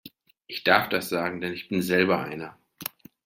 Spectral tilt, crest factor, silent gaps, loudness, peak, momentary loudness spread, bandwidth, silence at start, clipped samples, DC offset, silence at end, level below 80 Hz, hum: -4.5 dB/octave; 26 dB; none; -25 LUFS; -2 dBFS; 16 LU; 16.5 kHz; 0.05 s; under 0.1%; under 0.1%; 0.4 s; -66 dBFS; none